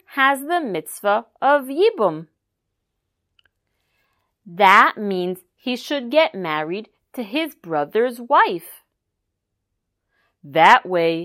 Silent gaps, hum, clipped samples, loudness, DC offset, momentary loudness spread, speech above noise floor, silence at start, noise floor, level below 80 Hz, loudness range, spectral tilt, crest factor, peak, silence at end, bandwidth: none; none; under 0.1%; -18 LUFS; under 0.1%; 16 LU; 59 dB; 0.1 s; -78 dBFS; -72 dBFS; 4 LU; -4.5 dB/octave; 20 dB; 0 dBFS; 0 s; 16 kHz